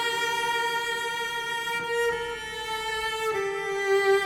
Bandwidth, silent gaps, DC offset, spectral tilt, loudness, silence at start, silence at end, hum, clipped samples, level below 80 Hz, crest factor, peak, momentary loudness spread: 18 kHz; none; under 0.1%; -1.5 dB/octave; -27 LUFS; 0 s; 0 s; none; under 0.1%; -58 dBFS; 16 dB; -12 dBFS; 6 LU